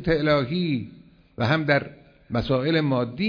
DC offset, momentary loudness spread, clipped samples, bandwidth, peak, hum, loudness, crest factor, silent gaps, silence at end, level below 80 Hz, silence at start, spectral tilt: under 0.1%; 9 LU; under 0.1%; 5.4 kHz; -8 dBFS; none; -24 LUFS; 16 dB; none; 0 s; -48 dBFS; 0 s; -8 dB/octave